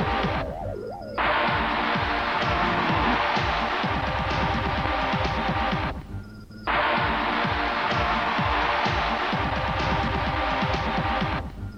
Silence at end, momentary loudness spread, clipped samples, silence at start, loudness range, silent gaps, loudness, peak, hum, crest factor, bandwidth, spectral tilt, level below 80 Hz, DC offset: 0 s; 8 LU; under 0.1%; 0 s; 2 LU; none; -25 LUFS; -8 dBFS; none; 18 dB; 12.5 kHz; -6 dB/octave; -36 dBFS; under 0.1%